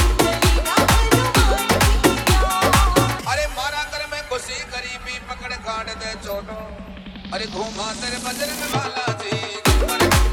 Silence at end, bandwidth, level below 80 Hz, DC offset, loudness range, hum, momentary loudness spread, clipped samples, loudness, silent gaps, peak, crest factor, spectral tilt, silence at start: 0 s; 19.5 kHz; -24 dBFS; under 0.1%; 12 LU; none; 13 LU; under 0.1%; -20 LUFS; none; 0 dBFS; 20 dB; -4 dB/octave; 0 s